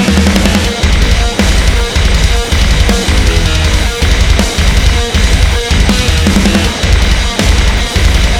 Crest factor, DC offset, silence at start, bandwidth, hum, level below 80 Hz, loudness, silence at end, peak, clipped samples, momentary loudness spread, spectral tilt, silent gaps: 8 dB; under 0.1%; 0 s; 16 kHz; none; -10 dBFS; -10 LUFS; 0 s; 0 dBFS; 0.2%; 2 LU; -4.5 dB/octave; none